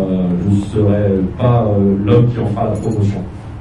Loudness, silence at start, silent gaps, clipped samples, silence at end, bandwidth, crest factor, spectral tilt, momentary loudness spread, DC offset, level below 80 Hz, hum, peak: -15 LUFS; 0 s; none; under 0.1%; 0 s; 10.5 kHz; 14 dB; -9.5 dB/octave; 6 LU; under 0.1%; -34 dBFS; none; 0 dBFS